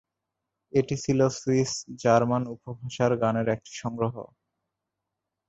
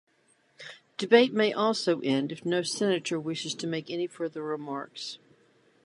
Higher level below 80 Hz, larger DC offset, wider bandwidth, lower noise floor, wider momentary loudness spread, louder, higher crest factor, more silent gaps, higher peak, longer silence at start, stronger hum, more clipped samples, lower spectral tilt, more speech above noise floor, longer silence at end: first, -60 dBFS vs -80 dBFS; neither; second, 8.2 kHz vs 11.5 kHz; first, -85 dBFS vs -67 dBFS; second, 13 LU vs 17 LU; about the same, -26 LUFS vs -28 LUFS; about the same, 20 dB vs 24 dB; neither; about the same, -6 dBFS vs -6 dBFS; first, 0.75 s vs 0.6 s; neither; neither; first, -6 dB/octave vs -4.5 dB/octave; first, 59 dB vs 39 dB; first, 1.25 s vs 0.7 s